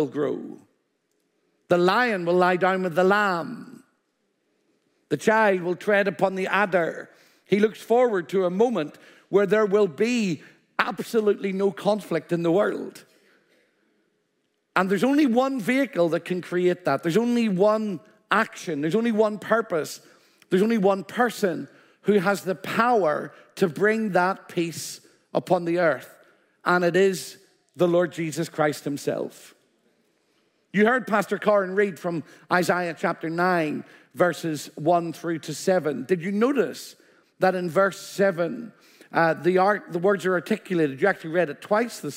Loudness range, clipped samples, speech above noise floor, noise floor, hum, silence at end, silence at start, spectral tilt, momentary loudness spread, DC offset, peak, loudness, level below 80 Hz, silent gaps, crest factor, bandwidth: 3 LU; under 0.1%; 50 dB; -73 dBFS; none; 0 s; 0 s; -5.5 dB/octave; 10 LU; under 0.1%; -4 dBFS; -23 LUFS; -76 dBFS; none; 20 dB; 16 kHz